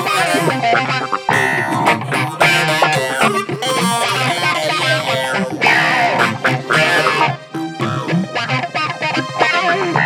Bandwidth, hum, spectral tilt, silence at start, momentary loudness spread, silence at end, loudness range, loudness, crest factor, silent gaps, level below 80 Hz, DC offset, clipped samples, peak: 20 kHz; none; -4 dB/octave; 0 s; 6 LU; 0 s; 2 LU; -15 LUFS; 14 dB; none; -60 dBFS; under 0.1%; under 0.1%; -2 dBFS